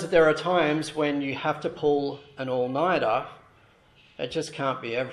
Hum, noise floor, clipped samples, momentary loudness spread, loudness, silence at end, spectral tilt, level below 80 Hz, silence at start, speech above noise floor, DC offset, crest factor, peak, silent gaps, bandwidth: none; -58 dBFS; under 0.1%; 10 LU; -26 LUFS; 0 s; -5.5 dB/octave; -60 dBFS; 0 s; 33 dB; under 0.1%; 20 dB; -6 dBFS; none; 12 kHz